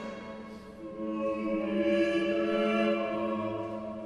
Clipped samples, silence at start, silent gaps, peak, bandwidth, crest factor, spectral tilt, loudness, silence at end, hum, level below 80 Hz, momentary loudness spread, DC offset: under 0.1%; 0 s; none; -16 dBFS; 10.5 kHz; 14 dB; -6.5 dB/octave; -30 LUFS; 0 s; none; -62 dBFS; 16 LU; under 0.1%